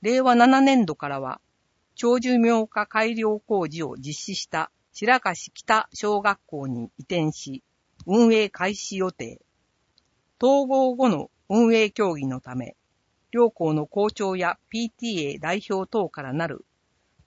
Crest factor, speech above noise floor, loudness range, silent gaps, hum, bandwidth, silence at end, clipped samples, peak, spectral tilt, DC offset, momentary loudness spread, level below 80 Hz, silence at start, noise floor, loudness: 20 dB; 48 dB; 3 LU; none; none; 8 kHz; 0.7 s; under 0.1%; -4 dBFS; -5 dB/octave; under 0.1%; 14 LU; -64 dBFS; 0 s; -70 dBFS; -23 LUFS